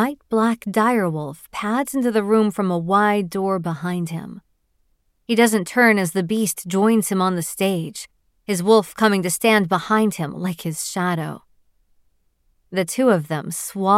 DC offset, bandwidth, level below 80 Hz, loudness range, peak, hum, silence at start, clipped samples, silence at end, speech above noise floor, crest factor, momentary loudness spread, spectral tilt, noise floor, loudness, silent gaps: under 0.1%; 16.5 kHz; -62 dBFS; 5 LU; -2 dBFS; none; 0 s; under 0.1%; 0 s; 45 dB; 18 dB; 11 LU; -5 dB/octave; -65 dBFS; -20 LUFS; none